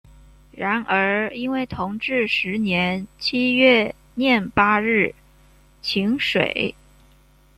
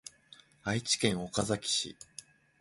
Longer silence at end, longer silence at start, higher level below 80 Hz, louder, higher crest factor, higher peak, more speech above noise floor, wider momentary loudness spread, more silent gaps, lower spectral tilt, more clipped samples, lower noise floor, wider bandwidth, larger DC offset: first, 0.85 s vs 0.4 s; first, 0.55 s vs 0.05 s; first, -52 dBFS vs -62 dBFS; first, -20 LUFS vs -32 LUFS; about the same, 20 dB vs 24 dB; first, -2 dBFS vs -12 dBFS; first, 33 dB vs 27 dB; second, 9 LU vs 20 LU; neither; first, -6 dB/octave vs -3 dB/octave; neither; second, -54 dBFS vs -60 dBFS; first, 13 kHz vs 11.5 kHz; neither